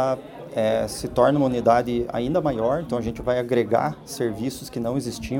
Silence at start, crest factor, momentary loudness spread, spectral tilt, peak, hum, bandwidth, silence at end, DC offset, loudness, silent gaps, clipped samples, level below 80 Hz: 0 s; 20 dB; 9 LU; -6 dB/octave; -4 dBFS; none; 17 kHz; 0 s; under 0.1%; -23 LUFS; none; under 0.1%; -46 dBFS